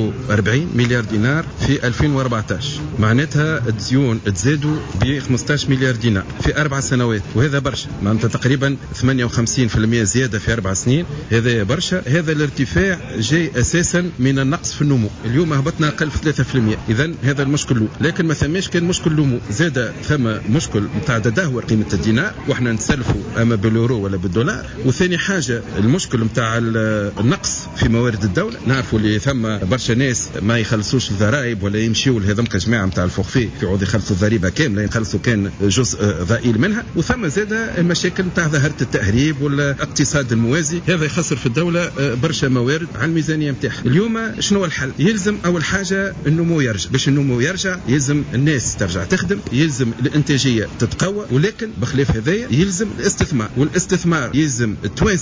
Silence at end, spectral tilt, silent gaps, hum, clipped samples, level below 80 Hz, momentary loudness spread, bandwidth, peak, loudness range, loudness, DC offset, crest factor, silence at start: 0 s; -5 dB/octave; none; none; under 0.1%; -34 dBFS; 3 LU; 8 kHz; -4 dBFS; 1 LU; -18 LUFS; under 0.1%; 12 dB; 0 s